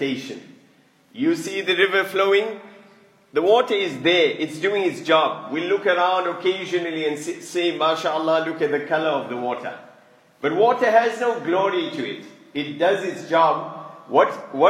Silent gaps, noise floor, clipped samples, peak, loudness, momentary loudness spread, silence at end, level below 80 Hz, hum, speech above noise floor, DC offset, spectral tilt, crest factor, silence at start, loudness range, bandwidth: none; -56 dBFS; under 0.1%; -2 dBFS; -21 LUFS; 12 LU; 0 s; -78 dBFS; none; 35 dB; under 0.1%; -4.5 dB/octave; 20 dB; 0 s; 3 LU; 15.5 kHz